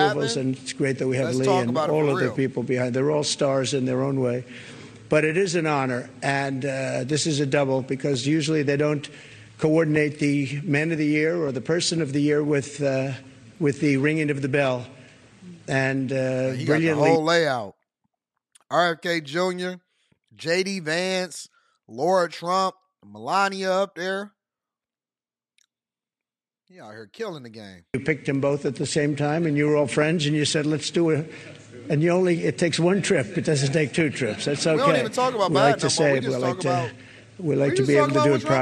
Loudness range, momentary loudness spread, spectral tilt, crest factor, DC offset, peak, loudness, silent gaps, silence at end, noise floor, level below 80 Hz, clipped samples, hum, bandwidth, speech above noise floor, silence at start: 6 LU; 12 LU; -5 dB/octave; 20 dB; under 0.1%; -4 dBFS; -23 LUFS; none; 0 s; under -90 dBFS; -64 dBFS; under 0.1%; none; 12.5 kHz; over 67 dB; 0 s